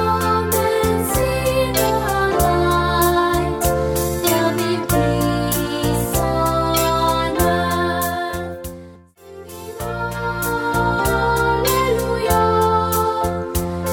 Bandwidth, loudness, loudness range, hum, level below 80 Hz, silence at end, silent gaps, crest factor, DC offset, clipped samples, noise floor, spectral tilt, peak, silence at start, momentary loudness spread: 19 kHz; -18 LUFS; 5 LU; none; -32 dBFS; 0 s; none; 14 dB; under 0.1%; under 0.1%; -42 dBFS; -4.5 dB/octave; -4 dBFS; 0 s; 8 LU